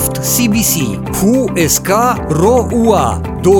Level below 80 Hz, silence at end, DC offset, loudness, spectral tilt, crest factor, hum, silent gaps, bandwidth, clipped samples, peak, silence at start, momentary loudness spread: -32 dBFS; 0 s; under 0.1%; -12 LUFS; -4.5 dB/octave; 12 dB; none; none; 19 kHz; under 0.1%; 0 dBFS; 0 s; 4 LU